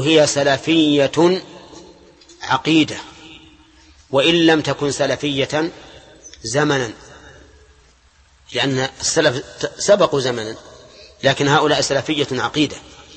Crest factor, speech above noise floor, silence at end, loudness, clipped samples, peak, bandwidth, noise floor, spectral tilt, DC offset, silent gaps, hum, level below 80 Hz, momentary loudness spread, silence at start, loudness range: 18 dB; 36 dB; 0.35 s; -17 LUFS; under 0.1%; -2 dBFS; 8.8 kHz; -53 dBFS; -4 dB/octave; under 0.1%; none; none; -52 dBFS; 14 LU; 0 s; 5 LU